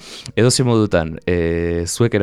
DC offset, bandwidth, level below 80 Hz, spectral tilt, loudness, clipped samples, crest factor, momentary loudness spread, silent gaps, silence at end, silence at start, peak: under 0.1%; 14.5 kHz; -38 dBFS; -5 dB/octave; -17 LUFS; under 0.1%; 14 dB; 6 LU; none; 0 s; 0 s; -2 dBFS